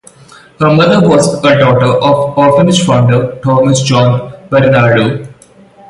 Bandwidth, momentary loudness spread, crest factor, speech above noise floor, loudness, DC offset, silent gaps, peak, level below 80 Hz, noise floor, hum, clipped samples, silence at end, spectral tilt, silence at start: 11.5 kHz; 5 LU; 10 dB; 32 dB; -9 LUFS; under 0.1%; none; 0 dBFS; -42 dBFS; -40 dBFS; none; under 0.1%; 0.6 s; -6 dB/octave; 0.6 s